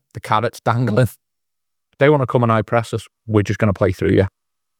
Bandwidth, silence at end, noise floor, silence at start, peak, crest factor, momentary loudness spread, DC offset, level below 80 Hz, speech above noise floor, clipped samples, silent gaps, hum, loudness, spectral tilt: 16 kHz; 0.5 s; -82 dBFS; 0.15 s; 0 dBFS; 18 dB; 6 LU; under 0.1%; -52 dBFS; 66 dB; under 0.1%; none; none; -18 LUFS; -7.5 dB/octave